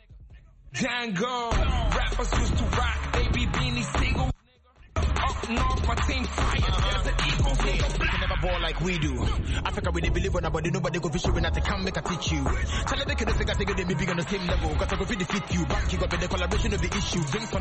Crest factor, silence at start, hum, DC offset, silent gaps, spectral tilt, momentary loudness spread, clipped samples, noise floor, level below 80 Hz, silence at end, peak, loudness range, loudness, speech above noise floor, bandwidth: 14 dB; 0.1 s; none; under 0.1%; none; -5 dB/octave; 2 LU; under 0.1%; -56 dBFS; -30 dBFS; 0 s; -12 dBFS; 1 LU; -27 LUFS; 30 dB; 8.8 kHz